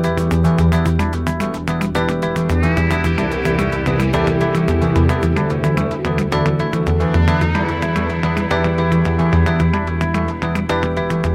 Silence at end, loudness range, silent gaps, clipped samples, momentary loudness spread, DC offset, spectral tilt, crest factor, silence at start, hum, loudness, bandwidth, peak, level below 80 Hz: 0 s; 1 LU; none; under 0.1%; 4 LU; under 0.1%; -7.5 dB/octave; 16 dB; 0 s; none; -17 LUFS; 13.5 kHz; -2 dBFS; -26 dBFS